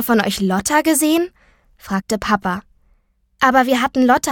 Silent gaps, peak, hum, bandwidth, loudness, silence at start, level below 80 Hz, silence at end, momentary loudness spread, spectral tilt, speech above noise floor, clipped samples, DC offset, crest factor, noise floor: none; 0 dBFS; none; 18 kHz; -17 LUFS; 0 s; -46 dBFS; 0 s; 10 LU; -4 dB/octave; 43 dB; under 0.1%; under 0.1%; 18 dB; -59 dBFS